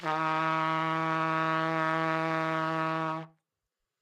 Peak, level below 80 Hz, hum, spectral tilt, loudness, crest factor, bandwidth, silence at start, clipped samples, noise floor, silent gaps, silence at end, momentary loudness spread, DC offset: -14 dBFS; -84 dBFS; none; -6 dB/octave; -29 LUFS; 16 dB; 12.5 kHz; 0 s; under 0.1%; -87 dBFS; none; 0.75 s; 3 LU; under 0.1%